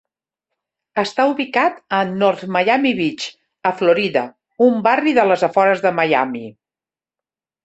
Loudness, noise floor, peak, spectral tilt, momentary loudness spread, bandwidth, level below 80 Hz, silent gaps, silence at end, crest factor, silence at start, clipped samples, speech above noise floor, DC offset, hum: -17 LUFS; under -90 dBFS; -2 dBFS; -5.5 dB/octave; 10 LU; 8.2 kHz; -64 dBFS; none; 1.15 s; 16 dB; 0.95 s; under 0.1%; over 73 dB; under 0.1%; none